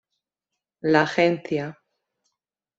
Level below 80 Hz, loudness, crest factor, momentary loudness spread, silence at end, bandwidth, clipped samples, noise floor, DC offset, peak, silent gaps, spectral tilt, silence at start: -68 dBFS; -22 LUFS; 22 dB; 11 LU; 1.05 s; 7.8 kHz; under 0.1%; -85 dBFS; under 0.1%; -4 dBFS; none; -6 dB/octave; 0.85 s